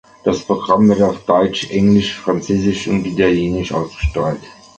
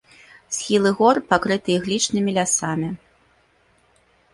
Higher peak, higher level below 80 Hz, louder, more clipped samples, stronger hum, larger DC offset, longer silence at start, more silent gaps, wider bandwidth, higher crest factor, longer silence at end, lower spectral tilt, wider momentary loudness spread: about the same, -2 dBFS vs -2 dBFS; first, -34 dBFS vs -58 dBFS; first, -16 LUFS vs -20 LUFS; neither; neither; neither; second, 0.25 s vs 0.5 s; neither; second, 8.6 kHz vs 11.5 kHz; second, 14 dB vs 20 dB; second, 0.25 s vs 1.4 s; first, -6.5 dB/octave vs -3.5 dB/octave; second, 8 LU vs 11 LU